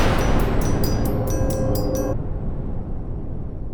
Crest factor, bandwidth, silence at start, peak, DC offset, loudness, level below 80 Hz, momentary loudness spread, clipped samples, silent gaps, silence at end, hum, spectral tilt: 14 dB; over 20 kHz; 0 s; -6 dBFS; under 0.1%; -24 LUFS; -24 dBFS; 10 LU; under 0.1%; none; 0 s; none; -6.5 dB/octave